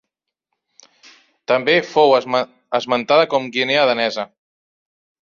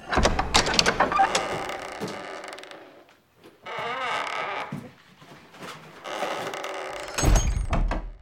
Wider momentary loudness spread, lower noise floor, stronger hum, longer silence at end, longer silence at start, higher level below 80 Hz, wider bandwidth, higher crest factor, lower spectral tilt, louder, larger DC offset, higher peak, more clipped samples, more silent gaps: second, 9 LU vs 19 LU; first, -78 dBFS vs -55 dBFS; neither; first, 1.05 s vs 0.05 s; first, 1.5 s vs 0 s; second, -68 dBFS vs -32 dBFS; second, 7.4 kHz vs 16.5 kHz; second, 18 dB vs 28 dB; first, -4.5 dB/octave vs -3 dB/octave; first, -17 LUFS vs -26 LUFS; neither; about the same, -2 dBFS vs 0 dBFS; neither; neither